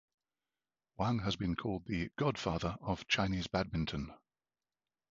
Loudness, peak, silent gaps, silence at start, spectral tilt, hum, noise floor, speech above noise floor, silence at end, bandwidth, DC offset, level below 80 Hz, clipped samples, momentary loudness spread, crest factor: -36 LUFS; -16 dBFS; none; 1 s; -4.5 dB/octave; none; under -90 dBFS; over 54 dB; 1 s; 7.4 kHz; under 0.1%; -54 dBFS; under 0.1%; 7 LU; 22 dB